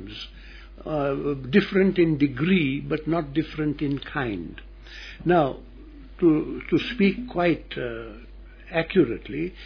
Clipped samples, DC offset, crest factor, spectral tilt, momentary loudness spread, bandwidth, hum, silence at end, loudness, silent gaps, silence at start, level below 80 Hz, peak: under 0.1%; under 0.1%; 18 dB; -8.5 dB/octave; 19 LU; 5.4 kHz; none; 0 s; -24 LUFS; none; 0 s; -44 dBFS; -6 dBFS